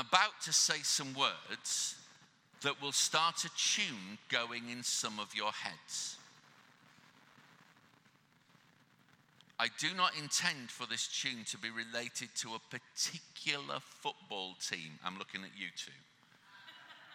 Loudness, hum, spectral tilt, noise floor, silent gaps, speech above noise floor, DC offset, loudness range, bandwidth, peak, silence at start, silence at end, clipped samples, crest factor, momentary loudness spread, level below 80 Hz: -36 LUFS; none; -0.5 dB/octave; -69 dBFS; none; 31 dB; under 0.1%; 10 LU; 17 kHz; -10 dBFS; 0 s; 0 s; under 0.1%; 30 dB; 14 LU; under -90 dBFS